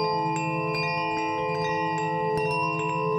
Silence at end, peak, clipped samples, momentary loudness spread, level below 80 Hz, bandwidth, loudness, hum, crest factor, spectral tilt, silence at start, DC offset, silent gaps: 0 s; -14 dBFS; under 0.1%; 2 LU; -60 dBFS; 16.5 kHz; -26 LUFS; none; 12 dB; -5.5 dB/octave; 0 s; under 0.1%; none